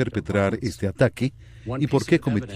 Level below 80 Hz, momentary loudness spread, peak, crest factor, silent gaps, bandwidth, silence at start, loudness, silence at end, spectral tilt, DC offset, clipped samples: -48 dBFS; 8 LU; -4 dBFS; 18 dB; none; 14.5 kHz; 0 s; -24 LUFS; 0 s; -7 dB/octave; under 0.1%; under 0.1%